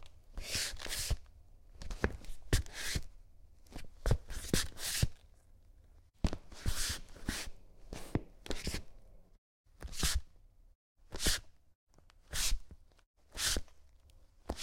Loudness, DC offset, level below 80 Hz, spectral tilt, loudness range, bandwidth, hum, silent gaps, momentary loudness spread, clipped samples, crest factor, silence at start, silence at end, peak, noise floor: -38 LUFS; under 0.1%; -44 dBFS; -3 dB/octave; 4 LU; 16.5 kHz; none; 9.38-9.64 s, 10.75-10.95 s, 11.75-11.87 s, 13.06-13.14 s; 16 LU; under 0.1%; 28 dB; 0 s; 0 s; -12 dBFS; -61 dBFS